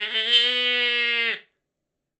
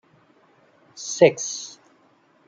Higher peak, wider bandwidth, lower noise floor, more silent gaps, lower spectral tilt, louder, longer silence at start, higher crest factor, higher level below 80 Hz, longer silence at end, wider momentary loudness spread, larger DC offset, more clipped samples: about the same, -4 dBFS vs -2 dBFS; about the same, 8.4 kHz vs 9 kHz; first, -83 dBFS vs -60 dBFS; neither; second, 0.5 dB/octave vs -3.5 dB/octave; about the same, -20 LUFS vs -21 LUFS; second, 0 s vs 0.95 s; about the same, 20 dB vs 24 dB; second, under -90 dBFS vs -72 dBFS; about the same, 0.8 s vs 0.75 s; second, 8 LU vs 18 LU; neither; neither